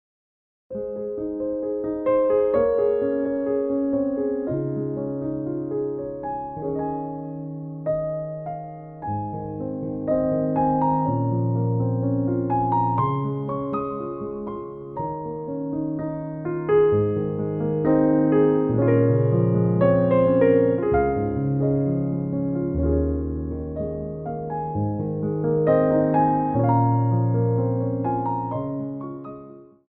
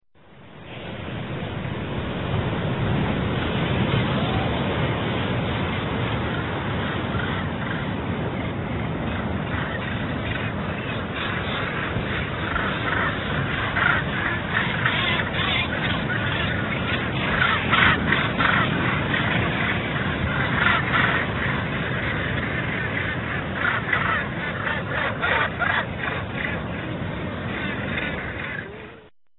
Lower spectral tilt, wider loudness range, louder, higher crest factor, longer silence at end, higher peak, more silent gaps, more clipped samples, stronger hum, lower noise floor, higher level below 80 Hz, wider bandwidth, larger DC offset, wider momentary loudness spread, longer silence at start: first, -10.5 dB/octave vs -9 dB/octave; first, 9 LU vs 6 LU; about the same, -23 LUFS vs -24 LUFS; second, 16 dB vs 22 dB; about the same, 0.25 s vs 0.25 s; about the same, -6 dBFS vs -4 dBFS; neither; neither; neither; second, -44 dBFS vs -49 dBFS; about the same, -42 dBFS vs -40 dBFS; second, 3.4 kHz vs 4.3 kHz; neither; first, 12 LU vs 9 LU; first, 0.7 s vs 0.3 s